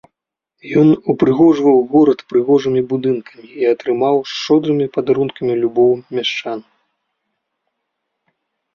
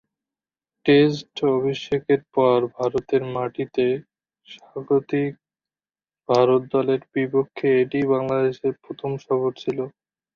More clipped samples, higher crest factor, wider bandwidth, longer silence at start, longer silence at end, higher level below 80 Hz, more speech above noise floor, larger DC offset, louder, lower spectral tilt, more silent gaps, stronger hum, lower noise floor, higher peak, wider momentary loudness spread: neither; about the same, 14 dB vs 18 dB; about the same, 7 kHz vs 7 kHz; second, 0.65 s vs 0.85 s; first, 2.15 s vs 0.45 s; about the same, -58 dBFS vs -62 dBFS; second, 64 dB vs over 69 dB; neither; first, -15 LUFS vs -22 LUFS; about the same, -7 dB/octave vs -7.5 dB/octave; neither; neither; second, -79 dBFS vs under -90 dBFS; first, -2 dBFS vs -6 dBFS; second, 8 LU vs 12 LU